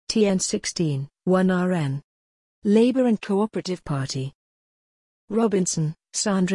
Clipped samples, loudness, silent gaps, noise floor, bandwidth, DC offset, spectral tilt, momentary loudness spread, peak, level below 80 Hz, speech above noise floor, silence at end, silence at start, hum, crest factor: under 0.1%; -23 LUFS; 2.04-2.62 s, 4.35-5.28 s; under -90 dBFS; 11 kHz; under 0.1%; -5.5 dB/octave; 10 LU; -8 dBFS; -58 dBFS; over 68 dB; 0 s; 0.1 s; none; 16 dB